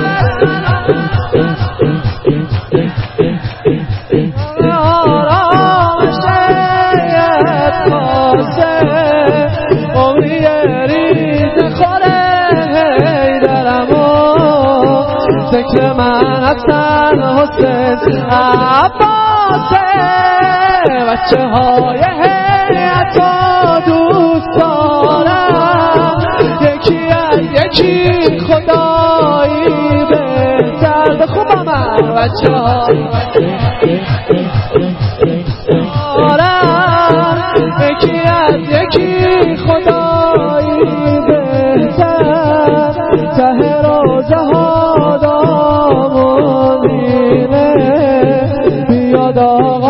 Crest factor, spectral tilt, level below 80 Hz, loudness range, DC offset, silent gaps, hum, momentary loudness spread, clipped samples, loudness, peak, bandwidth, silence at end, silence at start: 10 dB; -9.5 dB/octave; -32 dBFS; 2 LU; 0.4%; none; none; 4 LU; 0.1%; -10 LUFS; 0 dBFS; 5.8 kHz; 0 s; 0 s